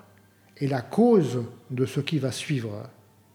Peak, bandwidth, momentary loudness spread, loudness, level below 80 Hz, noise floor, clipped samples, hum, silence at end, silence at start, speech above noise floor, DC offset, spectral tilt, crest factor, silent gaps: -8 dBFS; 16.5 kHz; 15 LU; -26 LUFS; -74 dBFS; -57 dBFS; under 0.1%; none; 0.45 s; 0.6 s; 32 dB; under 0.1%; -6.5 dB/octave; 18 dB; none